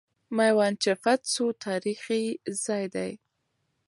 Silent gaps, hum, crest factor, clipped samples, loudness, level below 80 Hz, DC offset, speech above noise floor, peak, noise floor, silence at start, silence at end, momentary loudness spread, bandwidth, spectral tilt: none; none; 18 dB; under 0.1%; -27 LUFS; -76 dBFS; under 0.1%; 50 dB; -10 dBFS; -77 dBFS; 0.3 s; 0.7 s; 10 LU; 11.5 kHz; -3.5 dB/octave